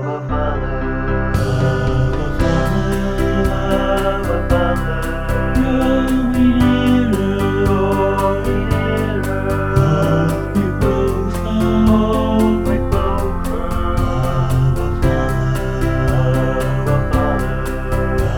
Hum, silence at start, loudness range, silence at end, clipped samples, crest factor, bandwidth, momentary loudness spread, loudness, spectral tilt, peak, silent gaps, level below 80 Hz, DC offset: none; 0 s; 2 LU; 0 s; under 0.1%; 14 dB; 18.5 kHz; 6 LU; -17 LUFS; -7.5 dB/octave; -2 dBFS; none; -22 dBFS; 0.9%